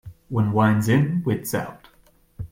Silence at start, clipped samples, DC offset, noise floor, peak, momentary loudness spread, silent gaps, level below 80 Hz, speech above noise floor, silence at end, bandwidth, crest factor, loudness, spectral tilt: 0.05 s; under 0.1%; under 0.1%; -57 dBFS; -6 dBFS; 12 LU; none; -52 dBFS; 36 dB; 0.05 s; 16.5 kHz; 16 dB; -22 LUFS; -7 dB/octave